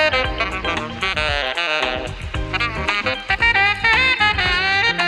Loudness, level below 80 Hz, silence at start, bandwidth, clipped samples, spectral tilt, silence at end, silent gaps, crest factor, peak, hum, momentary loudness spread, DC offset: -18 LUFS; -34 dBFS; 0 s; 12.5 kHz; under 0.1%; -3.5 dB/octave; 0 s; none; 14 dB; -4 dBFS; none; 9 LU; under 0.1%